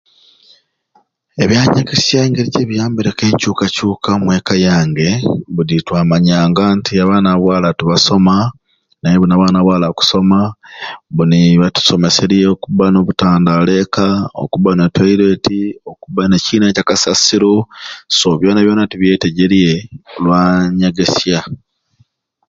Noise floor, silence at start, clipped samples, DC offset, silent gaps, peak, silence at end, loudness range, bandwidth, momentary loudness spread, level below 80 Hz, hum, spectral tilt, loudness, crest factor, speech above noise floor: -56 dBFS; 1.35 s; under 0.1%; under 0.1%; none; 0 dBFS; 0.95 s; 2 LU; 7.8 kHz; 8 LU; -40 dBFS; none; -5.5 dB/octave; -12 LUFS; 12 dB; 44 dB